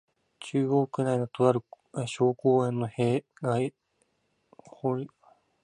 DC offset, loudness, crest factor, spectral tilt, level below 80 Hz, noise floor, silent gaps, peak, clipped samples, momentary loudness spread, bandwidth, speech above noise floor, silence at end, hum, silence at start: under 0.1%; -28 LUFS; 22 dB; -7.5 dB/octave; -70 dBFS; -74 dBFS; none; -8 dBFS; under 0.1%; 10 LU; 10.5 kHz; 47 dB; 0.55 s; none; 0.4 s